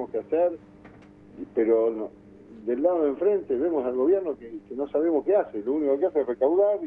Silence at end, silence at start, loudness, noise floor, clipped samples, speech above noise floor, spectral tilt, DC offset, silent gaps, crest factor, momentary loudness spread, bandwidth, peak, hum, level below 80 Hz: 0 s; 0 s; -25 LUFS; -49 dBFS; under 0.1%; 25 dB; -9.5 dB/octave; under 0.1%; none; 14 dB; 13 LU; 3.6 kHz; -10 dBFS; none; -62 dBFS